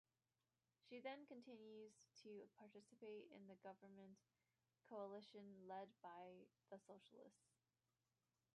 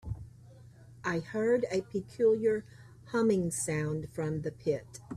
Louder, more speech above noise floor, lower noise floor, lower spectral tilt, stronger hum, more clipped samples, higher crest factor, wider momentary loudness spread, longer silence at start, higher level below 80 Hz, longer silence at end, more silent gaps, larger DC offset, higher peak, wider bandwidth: second, -61 LUFS vs -32 LUFS; first, over 29 dB vs 23 dB; first, under -90 dBFS vs -54 dBFS; about the same, -5.5 dB/octave vs -6 dB/octave; neither; neither; about the same, 20 dB vs 16 dB; about the same, 11 LU vs 10 LU; first, 0.85 s vs 0.05 s; second, under -90 dBFS vs -58 dBFS; first, 1.2 s vs 0 s; neither; neither; second, -42 dBFS vs -16 dBFS; second, 10.5 kHz vs 13.5 kHz